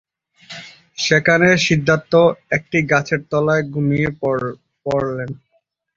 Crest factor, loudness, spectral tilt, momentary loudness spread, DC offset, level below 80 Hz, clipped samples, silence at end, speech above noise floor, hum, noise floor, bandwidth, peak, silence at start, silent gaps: 18 dB; -17 LUFS; -5.5 dB/octave; 21 LU; under 0.1%; -50 dBFS; under 0.1%; 0.6 s; 49 dB; none; -65 dBFS; 7.8 kHz; 0 dBFS; 0.5 s; none